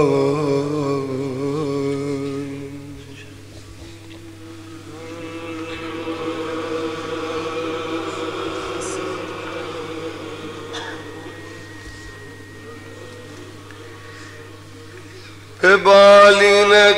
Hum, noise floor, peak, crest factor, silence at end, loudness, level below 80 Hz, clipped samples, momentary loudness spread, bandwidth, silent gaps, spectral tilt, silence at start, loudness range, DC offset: 50 Hz at -45 dBFS; -39 dBFS; 0 dBFS; 20 dB; 0 s; -17 LUFS; -52 dBFS; under 0.1%; 27 LU; 15 kHz; none; -4 dB/octave; 0 s; 20 LU; 0.4%